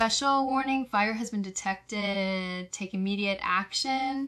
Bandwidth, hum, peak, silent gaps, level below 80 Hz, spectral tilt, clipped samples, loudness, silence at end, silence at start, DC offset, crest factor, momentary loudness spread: 12.5 kHz; none; -12 dBFS; none; -62 dBFS; -3.5 dB/octave; under 0.1%; -29 LUFS; 0 s; 0 s; under 0.1%; 18 dB; 7 LU